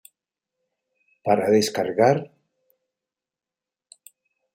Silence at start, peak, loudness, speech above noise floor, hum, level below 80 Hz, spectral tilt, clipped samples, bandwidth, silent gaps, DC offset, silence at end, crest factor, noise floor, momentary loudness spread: 1.25 s; -4 dBFS; -21 LUFS; 70 dB; none; -72 dBFS; -5 dB/octave; under 0.1%; 16 kHz; none; under 0.1%; 2.3 s; 22 dB; -89 dBFS; 12 LU